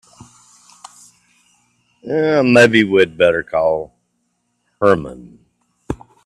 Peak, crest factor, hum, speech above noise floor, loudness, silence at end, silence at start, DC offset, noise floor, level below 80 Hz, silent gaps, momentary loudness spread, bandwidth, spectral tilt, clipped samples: 0 dBFS; 18 dB; 60 Hz at -40 dBFS; 54 dB; -14 LUFS; 0.3 s; 2.05 s; under 0.1%; -68 dBFS; -50 dBFS; none; 20 LU; 12.5 kHz; -5.5 dB/octave; under 0.1%